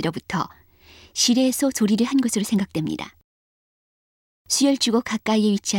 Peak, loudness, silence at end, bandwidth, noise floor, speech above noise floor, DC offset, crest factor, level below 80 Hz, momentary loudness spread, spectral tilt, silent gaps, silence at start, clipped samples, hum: -6 dBFS; -21 LUFS; 0 s; 17 kHz; -50 dBFS; 29 dB; under 0.1%; 16 dB; -58 dBFS; 11 LU; -3.5 dB/octave; 3.24-4.45 s; 0 s; under 0.1%; none